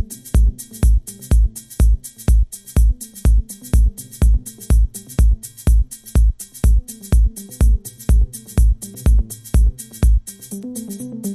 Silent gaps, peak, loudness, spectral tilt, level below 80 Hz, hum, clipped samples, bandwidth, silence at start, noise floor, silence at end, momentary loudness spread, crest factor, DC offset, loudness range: none; -4 dBFS; -19 LUFS; -6.5 dB/octave; -16 dBFS; none; under 0.1%; 14 kHz; 0 s; -31 dBFS; 0 s; 4 LU; 12 dB; under 0.1%; 0 LU